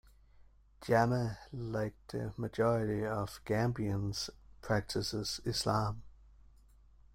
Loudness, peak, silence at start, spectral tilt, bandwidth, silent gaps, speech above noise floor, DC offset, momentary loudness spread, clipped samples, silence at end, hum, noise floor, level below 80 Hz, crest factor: -35 LUFS; -16 dBFS; 0.4 s; -5.5 dB/octave; 16 kHz; none; 27 dB; under 0.1%; 10 LU; under 0.1%; 1.05 s; none; -61 dBFS; -56 dBFS; 20 dB